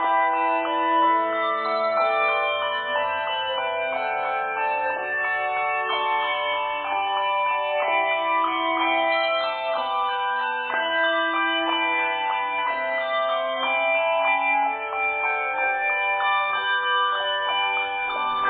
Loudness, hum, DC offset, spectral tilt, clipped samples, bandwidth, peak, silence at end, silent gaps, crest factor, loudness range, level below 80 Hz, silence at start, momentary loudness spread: -23 LUFS; none; under 0.1%; -5.5 dB/octave; under 0.1%; 4.7 kHz; -10 dBFS; 0 s; none; 14 dB; 2 LU; -68 dBFS; 0 s; 4 LU